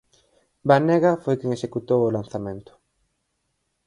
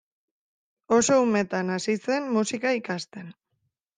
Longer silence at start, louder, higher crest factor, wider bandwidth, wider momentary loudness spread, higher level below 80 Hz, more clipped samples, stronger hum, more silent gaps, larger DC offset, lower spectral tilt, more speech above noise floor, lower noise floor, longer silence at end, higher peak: second, 0.65 s vs 0.9 s; first, -22 LUFS vs -25 LUFS; about the same, 22 dB vs 18 dB; first, 11 kHz vs 9.8 kHz; about the same, 14 LU vs 13 LU; first, -60 dBFS vs -68 dBFS; neither; neither; neither; neither; first, -8 dB/octave vs -4 dB/octave; about the same, 53 dB vs 52 dB; about the same, -74 dBFS vs -77 dBFS; first, 1.25 s vs 0.65 s; first, -2 dBFS vs -8 dBFS